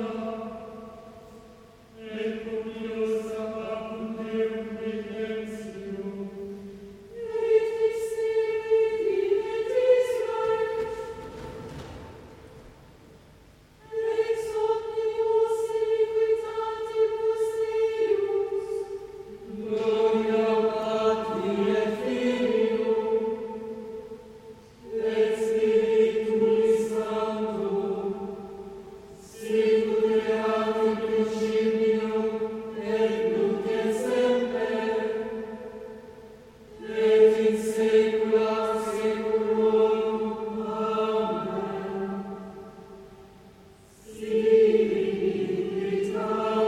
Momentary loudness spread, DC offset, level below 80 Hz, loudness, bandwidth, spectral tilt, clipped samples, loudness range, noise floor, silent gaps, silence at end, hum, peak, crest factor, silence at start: 18 LU; under 0.1%; -60 dBFS; -26 LUFS; 12 kHz; -6 dB/octave; under 0.1%; 8 LU; -54 dBFS; none; 0 s; none; -8 dBFS; 18 dB; 0 s